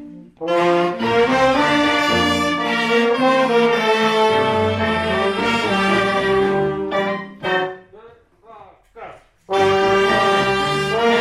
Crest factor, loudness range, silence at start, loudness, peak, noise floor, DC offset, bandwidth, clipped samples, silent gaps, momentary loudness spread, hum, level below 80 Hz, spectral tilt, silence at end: 14 dB; 6 LU; 0 s; -17 LUFS; -4 dBFS; -46 dBFS; under 0.1%; 15 kHz; under 0.1%; none; 6 LU; none; -50 dBFS; -4.5 dB/octave; 0 s